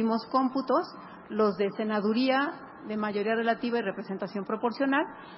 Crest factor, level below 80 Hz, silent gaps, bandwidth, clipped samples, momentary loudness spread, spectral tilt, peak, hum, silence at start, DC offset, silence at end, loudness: 16 dB; -74 dBFS; none; 5.8 kHz; under 0.1%; 9 LU; -9.5 dB/octave; -12 dBFS; none; 0 s; under 0.1%; 0 s; -29 LUFS